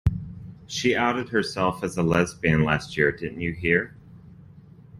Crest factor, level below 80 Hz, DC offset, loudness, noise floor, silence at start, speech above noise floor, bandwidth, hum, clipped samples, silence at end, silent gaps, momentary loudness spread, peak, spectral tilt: 20 dB; -42 dBFS; under 0.1%; -24 LUFS; -48 dBFS; 0.05 s; 24 dB; 13 kHz; none; under 0.1%; 0 s; none; 11 LU; -6 dBFS; -5.5 dB/octave